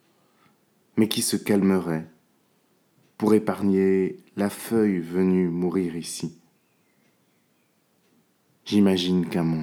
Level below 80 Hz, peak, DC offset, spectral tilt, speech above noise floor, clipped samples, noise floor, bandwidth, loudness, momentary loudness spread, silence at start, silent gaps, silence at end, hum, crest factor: -66 dBFS; -4 dBFS; under 0.1%; -6 dB/octave; 44 dB; under 0.1%; -67 dBFS; 17.5 kHz; -24 LUFS; 11 LU; 0.95 s; none; 0 s; none; 22 dB